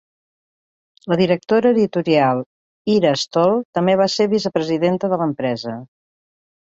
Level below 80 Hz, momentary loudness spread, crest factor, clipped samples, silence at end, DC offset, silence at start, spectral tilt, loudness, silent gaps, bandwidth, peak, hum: -60 dBFS; 10 LU; 16 dB; under 0.1%; 0.85 s; under 0.1%; 1.05 s; -6 dB/octave; -18 LUFS; 2.46-2.85 s, 3.65-3.73 s; 8 kHz; -2 dBFS; none